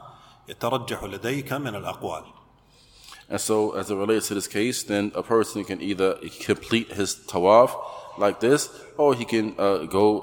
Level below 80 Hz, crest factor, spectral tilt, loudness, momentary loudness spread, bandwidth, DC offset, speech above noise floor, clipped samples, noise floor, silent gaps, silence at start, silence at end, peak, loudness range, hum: -58 dBFS; 20 dB; -4.5 dB/octave; -24 LUFS; 11 LU; 19 kHz; under 0.1%; 32 dB; under 0.1%; -56 dBFS; none; 0 s; 0 s; -4 dBFS; 7 LU; none